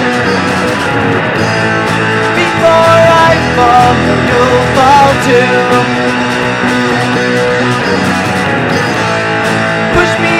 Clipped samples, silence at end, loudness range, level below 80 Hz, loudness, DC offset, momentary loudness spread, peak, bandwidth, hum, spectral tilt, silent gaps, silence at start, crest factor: 0.8%; 0 s; 4 LU; -34 dBFS; -9 LUFS; 0.2%; 6 LU; 0 dBFS; 16 kHz; none; -5 dB/octave; none; 0 s; 8 dB